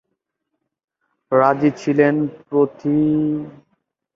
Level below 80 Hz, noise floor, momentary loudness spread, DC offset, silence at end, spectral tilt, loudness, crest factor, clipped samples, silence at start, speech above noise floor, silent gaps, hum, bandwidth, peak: -60 dBFS; -77 dBFS; 7 LU; under 0.1%; 0.65 s; -8.5 dB/octave; -18 LUFS; 18 dB; under 0.1%; 1.3 s; 59 dB; none; none; 7.4 kHz; -2 dBFS